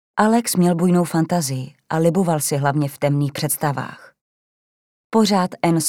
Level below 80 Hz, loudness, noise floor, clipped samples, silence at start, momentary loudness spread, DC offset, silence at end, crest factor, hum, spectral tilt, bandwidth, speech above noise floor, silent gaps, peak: -64 dBFS; -19 LUFS; under -90 dBFS; under 0.1%; 0.15 s; 8 LU; under 0.1%; 0 s; 18 dB; none; -5.5 dB/octave; 17.5 kHz; over 72 dB; 4.21-5.10 s; -2 dBFS